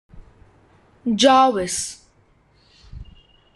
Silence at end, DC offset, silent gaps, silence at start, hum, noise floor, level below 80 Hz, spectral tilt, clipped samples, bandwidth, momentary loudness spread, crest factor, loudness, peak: 0.55 s; under 0.1%; none; 0.15 s; none; -58 dBFS; -48 dBFS; -3 dB/octave; under 0.1%; 12.5 kHz; 16 LU; 20 dB; -18 LUFS; -2 dBFS